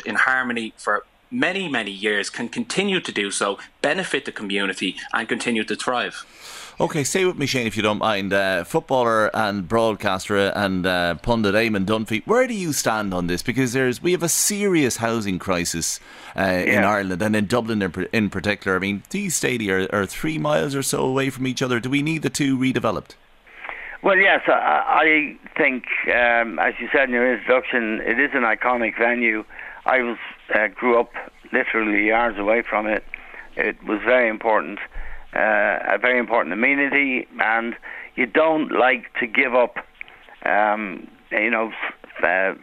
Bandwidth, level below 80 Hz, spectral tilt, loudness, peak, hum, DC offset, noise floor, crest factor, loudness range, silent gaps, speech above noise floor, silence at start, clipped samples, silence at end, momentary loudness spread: 16 kHz; -48 dBFS; -4 dB/octave; -21 LUFS; 0 dBFS; none; under 0.1%; -42 dBFS; 22 dB; 4 LU; none; 21 dB; 0 s; under 0.1%; 0.05 s; 9 LU